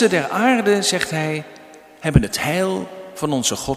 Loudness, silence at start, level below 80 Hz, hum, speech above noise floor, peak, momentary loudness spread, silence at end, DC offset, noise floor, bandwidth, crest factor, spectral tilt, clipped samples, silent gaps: -19 LUFS; 0 s; -36 dBFS; none; 24 dB; 0 dBFS; 11 LU; 0 s; under 0.1%; -43 dBFS; 15.5 kHz; 20 dB; -4.5 dB/octave; under 0.1%; none